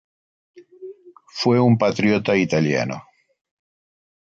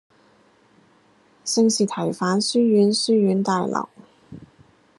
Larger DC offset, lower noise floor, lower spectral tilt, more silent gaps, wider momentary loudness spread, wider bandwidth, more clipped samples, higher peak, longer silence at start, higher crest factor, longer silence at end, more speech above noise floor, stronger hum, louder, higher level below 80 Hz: neither; second, -41 dBFS vs -57 dBFS; first, -6.5 dB/octave vs -4.5 dB/octave; neither; first, 24 LU vs 10 LU; second, 7.6 kHz vs 11.5 kHz; neither; about the same, -6 dBFS vs -6 dBFS; second, 0.55 s vs 1.45 s; about the same, 16 dB vs 16 dB; first, 1.2 s vs 0.6 s; second, 23 dB vs 38 dB; neither; about the same, -19 LUFS vs -20 LUFS; first, -58 dBFS vs -70 dBFS